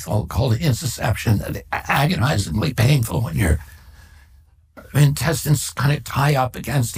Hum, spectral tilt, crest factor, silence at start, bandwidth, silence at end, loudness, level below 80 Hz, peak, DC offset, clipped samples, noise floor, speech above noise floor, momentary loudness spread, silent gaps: none; -5.5 dB/octave; 16 dB; 0 s; 16 kHz; 0 s; -20 LUFS; -34 dBFS; -4 dBFS; under 0.1%; under 0.1%; -51 dBFS; 32 dB; 5 LU; none